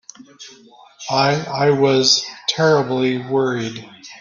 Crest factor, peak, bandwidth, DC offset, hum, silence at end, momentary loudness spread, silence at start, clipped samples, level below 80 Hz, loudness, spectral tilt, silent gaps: 18 dB; 0 dBFS; 7.4 kHz; under 0.1%; none; 0.05 s; 14 LU; 0.2 s; under 0.1%; -60 dBFS; -17 LUFS; -4 dB/octave; none